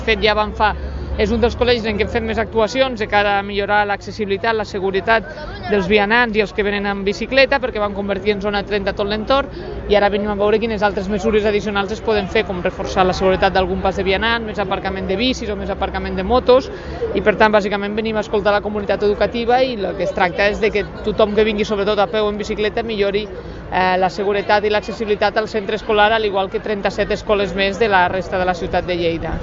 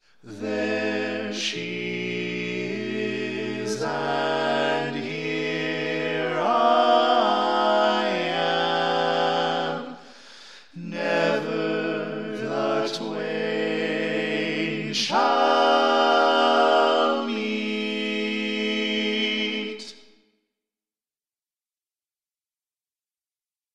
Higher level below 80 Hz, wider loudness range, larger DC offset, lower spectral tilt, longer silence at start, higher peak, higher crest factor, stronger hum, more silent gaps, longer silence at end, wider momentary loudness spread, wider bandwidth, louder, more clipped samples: first, -34 dBFS vs -78 dBFS; second, 2 LU vs 7 LU; second, under 0.1% vs 0.2%; first, -5.5 dB/octave vs -4 dB/octave; second, 0 s vs 0.25 s; first, 0 dBFS vs -6 dBFS; about the same, 18 dB vs 18 dB; neither; neither; second, 0 s vs 3.8 s; second, 7 LU vs 10 LU; second, 7.6 kHz vs 12 kHz; first, -18 LUFS vs -23 LUFS; neither